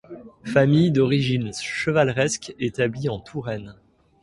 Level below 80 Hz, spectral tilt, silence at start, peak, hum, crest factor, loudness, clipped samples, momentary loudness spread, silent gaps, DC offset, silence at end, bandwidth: -54 dBFS; -6 dB/octave; 0.1 s; -4 dBFS; none; 18 dB; -22 LUFS; under 0.1%; 13 LU; none; under 0.1%; 0.5 s; 11.5 kHz